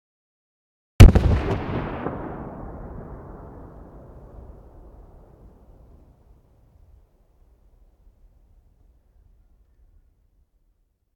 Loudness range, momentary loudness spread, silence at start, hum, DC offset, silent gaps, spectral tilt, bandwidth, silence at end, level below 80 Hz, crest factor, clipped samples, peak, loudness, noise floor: 26 LU; 33 LU; 1 s; none; under 0.1%; none; -7 dB/octave; 14 kHz; 8 s; -26 dBFS; 24 dB; 0.1%; 0 dBFS; -19 LUFS; -67 dBFS